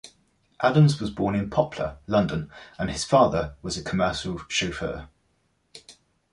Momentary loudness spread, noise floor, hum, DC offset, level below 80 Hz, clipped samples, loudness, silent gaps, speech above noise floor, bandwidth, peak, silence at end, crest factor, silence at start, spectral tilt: 13 LU; -69 dBFS; none; under 0.1%; -46 dBFS; under 0.1%; -25 LUFS; none; 45 dB; 11.5 kHz; -6 dBFS; 0.4 s; 20 dB; 0.05 s; -5.5 dB/octave